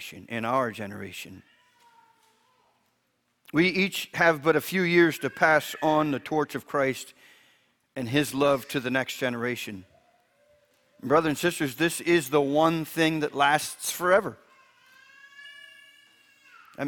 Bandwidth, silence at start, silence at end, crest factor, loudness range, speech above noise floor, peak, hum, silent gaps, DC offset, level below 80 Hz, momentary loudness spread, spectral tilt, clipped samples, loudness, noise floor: 19 kHz; 0 s; 0 s; 22 dB; 7 LU; 48 dB; -6 dBFS; none; none; under 0.1%; -66 dBFS; 17 LU; -4.5 dB/octave; under 0.1%; -25 LUFS; -73 dBFS